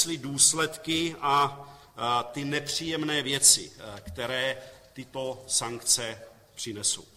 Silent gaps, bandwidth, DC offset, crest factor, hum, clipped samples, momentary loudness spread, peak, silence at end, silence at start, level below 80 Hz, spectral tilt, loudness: none; 16.5 kHz; under 0.1%; 24 dB; none; under 0.1%; 21 LU; -4 dBFS; 0.1 s; 0 s; -60 dBFS; -1.5 dB/octave; -25 LUFS